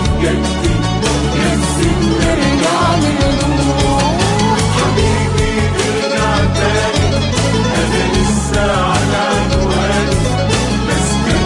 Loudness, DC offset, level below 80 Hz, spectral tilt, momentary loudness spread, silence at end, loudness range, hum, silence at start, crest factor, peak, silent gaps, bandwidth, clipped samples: -14 LUFS; under 0.1%; -22 dBFS; -5 dB/octave; 2 LU; 0 s; 1 LU; none; 0 s; 12 dB; -2 dBFS; none; 11.5 kHz; under 0.1%